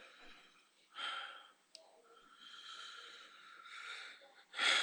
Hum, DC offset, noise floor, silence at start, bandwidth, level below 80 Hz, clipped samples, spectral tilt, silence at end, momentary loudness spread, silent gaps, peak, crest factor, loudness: none; under 0.1%; -69 dBFS; 0 s; over 20 kHz; -82 dBFS; under 0.1%; 2.5 dB/octave; 0 s; 18 LU; none; -18 dBFS; 26 dB; -44 LUFS